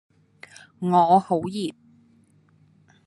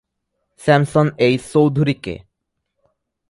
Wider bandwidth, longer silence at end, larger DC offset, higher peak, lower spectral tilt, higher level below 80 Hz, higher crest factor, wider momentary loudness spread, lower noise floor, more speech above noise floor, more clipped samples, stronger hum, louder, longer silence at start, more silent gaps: about the same, 12 kHz vs 11.5 kHz; first, 1.35 s vs 1.15 s; neither; second, -4 dBFS vs 0 dBFS; about the same, -7 dB/octave vs -7 dB/octave; second, -70 dBFS vs -52 dBFS; about the same, 20 dB vs 18 dB; about the same, 14 LU vs 12 LU; second, -59 dBFS vs -76 dBFS; second, 38 dB vs 60 dB; neither; neither; second, -22 LUFS vs -17 LUFS; first, 0.8 s vs 0.6 s; neither